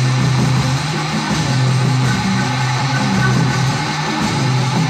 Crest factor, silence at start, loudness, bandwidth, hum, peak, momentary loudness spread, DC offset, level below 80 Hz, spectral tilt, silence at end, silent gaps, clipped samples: 12 dB; 0 s; -16 LUFS; 12.5 kHz; none; -4 dBFS; 3 LU; under 0.1%; -40 dBFS; -5 dB/octave; 0 s; none; under 0.1%